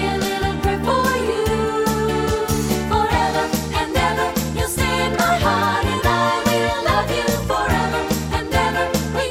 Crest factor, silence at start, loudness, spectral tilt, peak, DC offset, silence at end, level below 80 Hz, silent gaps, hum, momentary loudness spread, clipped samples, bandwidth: 16 dB; 0 s; -19 LUFS; -4.5 dB/octave; -4 dBFS; under 0.1%; 0 s; -32 dBFS; none; none; 4 LU; under 0.1%; 16.5 kHz